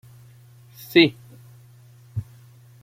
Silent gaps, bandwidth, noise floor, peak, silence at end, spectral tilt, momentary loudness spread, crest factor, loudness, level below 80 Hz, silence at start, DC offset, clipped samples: none; 16 kHz; -49 dBFS; -2 dBFS; 0.6 s; -6 dB/octave; 19 LU; 24 dB; -21 LUFS; -60 dBFS; 0.95 s; under 0.1%; under 0.1%